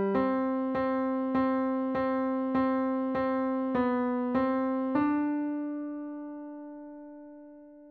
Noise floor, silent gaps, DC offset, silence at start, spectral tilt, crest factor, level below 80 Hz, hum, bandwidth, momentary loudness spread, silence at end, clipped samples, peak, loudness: -50 dBFS; none; under 0.1%; 0 s; -9.5 dB/octave; 14 dB; -62 dBFS; none; 4.6 kHz; 16 LU; 0 s; under 0.1%; -16 dBFS; -29 LUFS